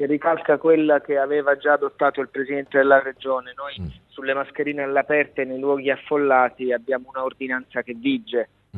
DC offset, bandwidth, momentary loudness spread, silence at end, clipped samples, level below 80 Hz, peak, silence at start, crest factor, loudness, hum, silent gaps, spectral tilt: under 0.1%; 4.2 kHz; 10 LU; 0 s; under 0.1%; -54 dBFS; -2 dBFS; 0 s; 20 dB; -21 LUFS; none; none; -8.5 dB/octave